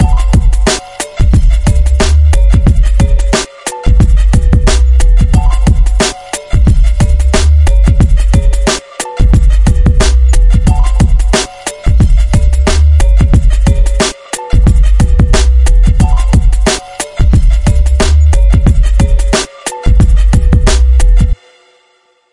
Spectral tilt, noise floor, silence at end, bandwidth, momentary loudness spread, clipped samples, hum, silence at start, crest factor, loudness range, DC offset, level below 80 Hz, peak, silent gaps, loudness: -5.5 dB/octave; -52 dBFS; 1 s; 11.5 kHz; 5 LU; under 0.1%; none; 0 s; 6 dB; 1 LU; 1%; -8 dBFS; 0 dBFS; none; -10 LUFS